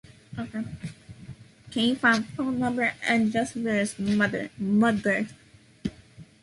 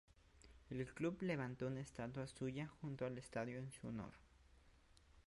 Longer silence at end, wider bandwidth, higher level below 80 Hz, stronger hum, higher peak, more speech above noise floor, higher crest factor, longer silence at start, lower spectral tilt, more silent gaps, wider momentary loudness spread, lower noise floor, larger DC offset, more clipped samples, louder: first, 0.2 s vs 0.05 s; about the same, 11.5 kHz vs 11.5 kHz; first, -58 dBFS vs -70 dBFS; neither; first, -8 dBFS vs -30 dBFS; about the same, 25 dB vs 23 dB; about the same, 20 dB vs 18 dB; about the same, 0.3 s vs 0.35 s; second, -5 dB/octave vs -6.5 dB/octave; neither; first, 18 LU vs 8 LU; second, -50 dBFS vs -70 dBFS; neither; neither; first, -26 LUFS vs -48 LUFS